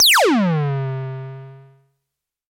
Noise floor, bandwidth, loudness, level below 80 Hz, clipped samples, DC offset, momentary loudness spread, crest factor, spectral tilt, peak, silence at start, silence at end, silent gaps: -81 dBFS; 16.5 kHz; -17 LUFS; -66 dBFS; under 0.1%; under 0.1%; 21 LU; 12 dB; -3.5 dB/octave; -8 dBFS; 0 s; 0.9 s; none